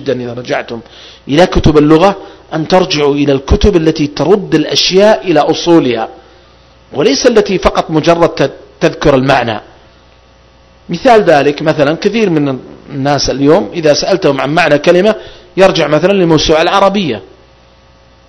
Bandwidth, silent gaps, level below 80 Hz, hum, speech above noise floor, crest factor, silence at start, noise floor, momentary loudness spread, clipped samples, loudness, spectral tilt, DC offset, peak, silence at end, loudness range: 11 kHz; none; -28 dBFS; none; 33 dB; 10 dB; 0 s; -43 dBFS; 11 LU; 2%; -10 LUFS; -5 dB/octave; under 0.1%; 0 dBFS; 1.05 s; 3 LU